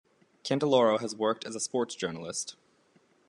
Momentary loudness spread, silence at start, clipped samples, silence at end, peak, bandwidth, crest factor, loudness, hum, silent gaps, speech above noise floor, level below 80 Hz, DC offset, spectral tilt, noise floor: 12 LU; 0.45 s; under 0.1%; 0.75 s; -12 dBFS; 11 kHz; 20 dB; -29 LUFS; none; none; 37 dB; -76 dBFS; under 0.1%; -4 dB/octave; -66 dBFS